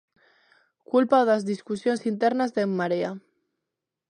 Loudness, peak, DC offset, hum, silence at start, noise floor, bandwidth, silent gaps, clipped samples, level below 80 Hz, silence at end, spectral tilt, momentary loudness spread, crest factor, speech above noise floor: -24 LUFS; -6 dBFS; under 0.1%; none; 0.95 s; -85 dBFS; 10.5 kHz; none; under 0.1%; -76 dBFS; 0.95 s; -6.5 dB/octave; 9 LU; 20 dB; 61 dB